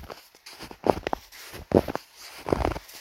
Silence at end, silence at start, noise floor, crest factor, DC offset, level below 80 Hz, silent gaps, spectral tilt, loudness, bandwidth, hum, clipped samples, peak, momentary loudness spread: 0 s; 0 s; -47 dBFS; 28 dB; under 0.1%; -42 dBFS; none; -6 dB/octave; -28 LUFS; 16.5 kHz; none; under 0.1%; 0 dBFS; 19 LU